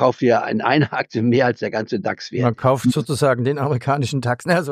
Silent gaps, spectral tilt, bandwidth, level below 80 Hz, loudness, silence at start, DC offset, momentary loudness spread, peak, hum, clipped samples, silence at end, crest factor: none; -6.5 dB/octave; 15 kHz; -58 dBFS; -19 LUFS; 0 s; under 0.1%; 6 LU; -2 dBFS; none; under 0.1%; 0 s; 16 dB